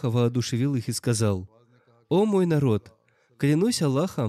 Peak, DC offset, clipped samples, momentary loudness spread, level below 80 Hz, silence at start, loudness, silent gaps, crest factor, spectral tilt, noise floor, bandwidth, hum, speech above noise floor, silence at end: -12 dBFS; under 0.1%; under 0.1%; 5 LU; -64 dBFS; 0 s; -24 LUFS; none; 12 dB; -6 dB/octave; -60 dBFS; 14.5 kHz; none; 37 dB; 0 s